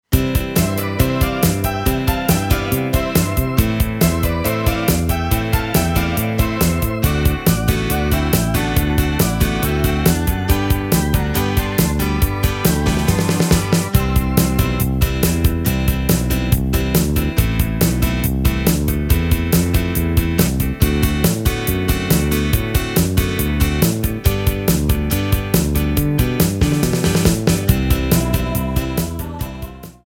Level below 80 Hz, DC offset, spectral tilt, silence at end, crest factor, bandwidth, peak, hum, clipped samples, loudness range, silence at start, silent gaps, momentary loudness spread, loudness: -22 dBFS; under 0.1%; -5.5 dB/octave; 0.15 s; 16 dB; 17 kHz; 0 dBFS; none; under 0.1%; 1 LU; 0.1 s; none; 2 LU; -17 LUFS